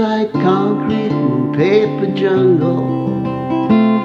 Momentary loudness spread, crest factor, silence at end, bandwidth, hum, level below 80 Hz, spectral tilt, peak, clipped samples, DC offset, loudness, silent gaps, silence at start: 6 LU; 14 dB; 0 s; 6.8 kHz; none; -52 dBFS; -9 dB/octave; 0 dBFS; under 0.1%; under 0.1%; -15 LUFS; none; 0 s